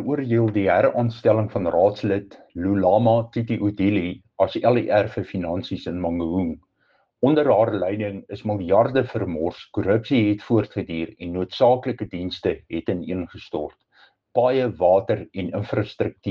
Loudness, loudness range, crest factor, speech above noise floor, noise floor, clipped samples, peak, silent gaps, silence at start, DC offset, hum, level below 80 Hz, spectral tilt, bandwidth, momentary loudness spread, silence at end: -22 LUFS; 4 LU; 16 dB; 44 dB; -65 dBFS; under 0.1%; -6 dBFS; none; 0 s; under 0.1%; none; -52 dBFS; -9 dB/octave; 7 kHz; 11 LU; 0 s